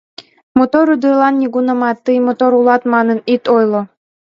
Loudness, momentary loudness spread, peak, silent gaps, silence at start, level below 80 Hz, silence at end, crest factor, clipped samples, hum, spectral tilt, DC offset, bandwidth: -13 LUFS; 4 LU; 0 dBFS; 0.43-0.55 s; 0.2 s; -58 dBFS; 0.4 s; 14 dB; under 0.1%; none; -7.5 dB/octave; under 0.1%; 6.8 kHz